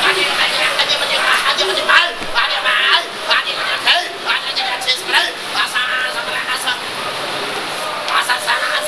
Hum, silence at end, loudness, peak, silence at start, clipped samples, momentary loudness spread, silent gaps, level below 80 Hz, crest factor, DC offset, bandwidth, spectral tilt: none; 0 s; -15 LUFS; 0 dBFS; 0 s; under 0.1%; 8 LU; none; -50 dBFS; 16 dB; 0.3%; 11 kHz; 0 dB/octave